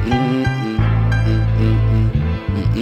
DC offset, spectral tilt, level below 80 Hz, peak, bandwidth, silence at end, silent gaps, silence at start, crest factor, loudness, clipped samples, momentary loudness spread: under 0.1%; -8 dB/octave; -24 dBFS; -4 dBFS; 6.8 kHz; 0 s; none; 0 s; 10 dB; -17 LUFS; under 0.1%; 4 LU